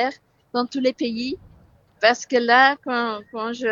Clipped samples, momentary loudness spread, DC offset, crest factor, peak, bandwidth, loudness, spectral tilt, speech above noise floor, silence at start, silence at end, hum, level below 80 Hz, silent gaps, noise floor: under 0.1%; 14 LU; under 0.1%; 20 dB; -2 dBFS; 7.6 kHz; -21 LUFS; -3 dB/octave; 33 dB; 0 s; 0 s; none; -60 dBFS; none; -54 dBFS